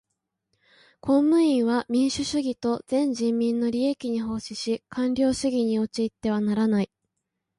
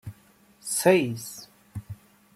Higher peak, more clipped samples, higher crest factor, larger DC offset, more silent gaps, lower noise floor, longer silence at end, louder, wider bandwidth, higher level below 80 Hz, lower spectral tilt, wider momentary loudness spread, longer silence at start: second, -10 dBFS vs -6 dBFS; neither; second, 14 dB vs 22 dB; neither; neither; first, -81 dBFS vs -58 dBFS; first, 0.75 s vs 0.4 s; about the same, -25 LUFS vs -24 LUFS; second, 11.5 kHz vs 16 kHz; first, -58 dBFS vs -64 dBFS; about the same, -5.5 dB/octave vs -4.5 dB/octave; second, 9 LU vs 24 LU; first, 1.05 s vs 0.05 s